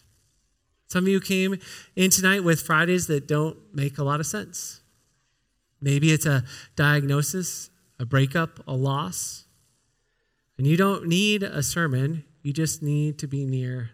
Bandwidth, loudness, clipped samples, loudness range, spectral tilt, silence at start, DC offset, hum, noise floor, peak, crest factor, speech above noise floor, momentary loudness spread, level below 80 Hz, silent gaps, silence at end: 17 kHz; -24 LUFS; under 0.1%; 5 LU; -4.5 dB/octave; 0.9 s; under 0.1%; none; -72 dBFS; -4 dBFS; 20 dB; 49 dB; 12 LU; -60 dBFS; none; 0.05 s